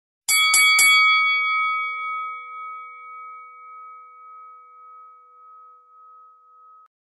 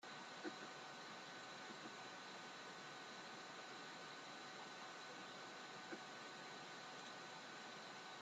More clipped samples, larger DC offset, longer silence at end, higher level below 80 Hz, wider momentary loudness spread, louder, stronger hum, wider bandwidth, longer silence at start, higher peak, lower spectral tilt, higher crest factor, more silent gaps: neither; neither; first, 2.65 s vs 0 s; first, -78 dBFS vs under -90 dBFS; first, 27 LU vs 1 LU; first, -16 LUFS vs -54 LUFS; neither; about the same, 12 kHz vs 13 kHz; first, 0.3 s vs 0 s; first, -4 dBFS vs -38 dBFS; second, 5 dB/octave vs -2.5 dB/octave; about the same, 20 dB vs 18 dB; neither